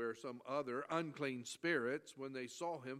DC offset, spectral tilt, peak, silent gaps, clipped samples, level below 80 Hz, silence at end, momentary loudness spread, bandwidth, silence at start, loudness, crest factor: under 0.1%; -4.5 dB/octave; -24 dBFS; none; under 0.1%; -90 dBFS; 0 s; 8 LU; 15 kHz; 0 s; -43 LUFS; 20 dB